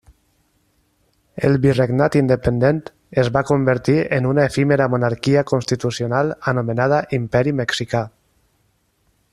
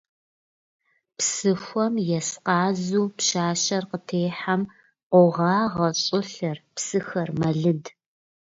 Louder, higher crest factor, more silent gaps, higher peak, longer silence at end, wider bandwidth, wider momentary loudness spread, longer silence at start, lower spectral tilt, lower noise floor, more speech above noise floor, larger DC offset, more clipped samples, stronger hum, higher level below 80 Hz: first, -18 LUFS vs -24 LUFS; about the same, 16 dB vs 20 dB; second, none vs 5.03-5.10 s; first, -2 dBFS vs -6 dBFS; first, 1.25 s vs 0.65 s; first, 12 kHz vs 8 kHz; second, 6 LU vs 9 LU; first, 1.35 s vs 1.2 s; first, -7 dB/octave vs -4.5 dB/octave; second, -64 dBFS vs under -90 dBFS; second, 46 dB vs over 67 dB; neither; neither; neither; first, -46 dBFS vs -64 dBFS